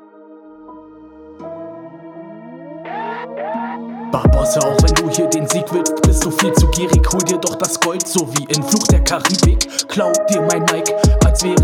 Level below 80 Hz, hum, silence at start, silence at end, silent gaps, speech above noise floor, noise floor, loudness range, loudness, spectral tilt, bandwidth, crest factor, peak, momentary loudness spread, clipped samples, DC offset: -22 dBFS; none; 0.3 s; 0 s; none; 26 dB; -40 dBFS; 14 LU; -15 LUFS; -4.5 dB/octave; 18 kHz; 16 dB; 0 dBFS; 19 LU; under 0.1%; under 0.1%